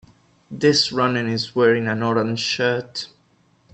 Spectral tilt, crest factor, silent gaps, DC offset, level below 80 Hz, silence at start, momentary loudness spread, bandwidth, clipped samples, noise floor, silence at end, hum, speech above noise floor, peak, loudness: -4.5 dB/octave; 18 dB; none; under 0.1%; -62 dBFS; 0.5 s; 14 LU; 8.6 kHz; under 0.1%; -59 dBFS; 0.65 s; none; 40 dB; -4 dBFS; -19 LUFS